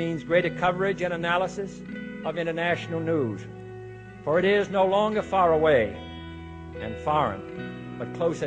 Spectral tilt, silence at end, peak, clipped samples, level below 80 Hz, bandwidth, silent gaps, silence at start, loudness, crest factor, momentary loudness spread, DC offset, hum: -6.5 dB/octave; 0 s; -10 dBFS; under 0.1%; -52 dBFS; 9.2 kHz; none; 0 s; -25 LUFS; 16 dB; 18 LU; under 0.1%; none